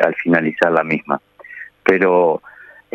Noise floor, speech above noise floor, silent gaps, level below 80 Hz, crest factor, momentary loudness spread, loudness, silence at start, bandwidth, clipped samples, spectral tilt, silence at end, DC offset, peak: -37 dBFS; 21 dB; none; -62 dBFS; 16 dB; 18 LU; -17 LUFS; 0 s; 7.8 kHz; under 0.1%; -7.5 dB/octave; 0.45 s; under 0.1%; -2 dBFS